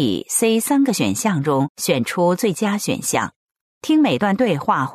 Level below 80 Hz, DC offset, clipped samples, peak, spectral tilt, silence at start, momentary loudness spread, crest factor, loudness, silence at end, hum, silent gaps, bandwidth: -60 dBFS; under 0.1%; under 0.1%; -4 dBFS; -4.5 dB/octave; 0 s; 4 LU; 14 dB; -19 LUFS; 0 s; none; 1.70-1.75 s, 3.36-3.55 s, 3.61-3.81 s; 13.5 kHz